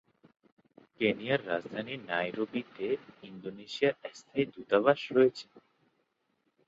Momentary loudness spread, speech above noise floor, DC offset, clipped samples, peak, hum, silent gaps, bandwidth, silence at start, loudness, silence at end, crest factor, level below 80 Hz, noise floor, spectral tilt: 17 LU; 46 dB; under 0.1%; under 0.1%; -12 dBFS; none; none; 7.8 kHz; 1 s; -31 LUFS; 1.1 s; 22 dB; -74 dBFS; -77 dBFS; -6 dB/octave